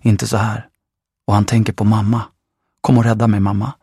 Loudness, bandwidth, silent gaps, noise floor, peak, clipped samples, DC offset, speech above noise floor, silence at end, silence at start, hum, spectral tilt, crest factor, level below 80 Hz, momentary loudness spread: -16 LUFS; 13.5 kHz; none; -80 dBFS; 0 dBFS; under 0.1%; under 0.1%; 66 dB; 0.1 s; 0.05 s; none; -7 dB/octave; 16 dB; -46 dBFS; 10 LU